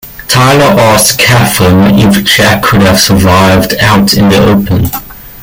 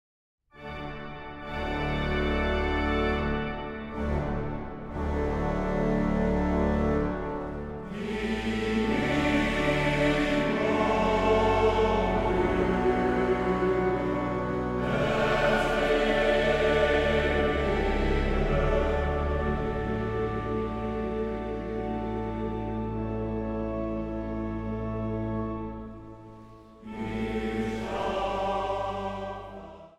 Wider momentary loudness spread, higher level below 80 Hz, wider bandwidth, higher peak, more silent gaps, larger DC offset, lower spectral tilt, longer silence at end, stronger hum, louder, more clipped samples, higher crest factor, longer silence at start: second, 4 LU vs 12 LU; first, -28 dBFS vs -36 dBFS; first, 18 kHz vs 13 kHz; first, 0 dBFS vs -12 dBFS; neither; neither; second, -4.5 dB/octave vs -7 dB/octave; about the same, 0 s vs 0.1 s; neither; first, -5 LUFS vs -28 LUFS; first, 0.7% vs under 0.1%; second, 6 dB vs 16 dB; second, 0.05 s vs 0.55 s